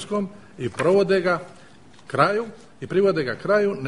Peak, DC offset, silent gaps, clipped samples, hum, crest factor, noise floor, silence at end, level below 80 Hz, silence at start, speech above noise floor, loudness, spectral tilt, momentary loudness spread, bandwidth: -4 dBFS; 0.3%; none; under 0.1%; none; 20 dB; -50 dBFS; 0 s; -58 dBFS; 0 s; 28 dB; -22 LUFS; -6.5 dB/octave; 13 LU; 10.5 kHz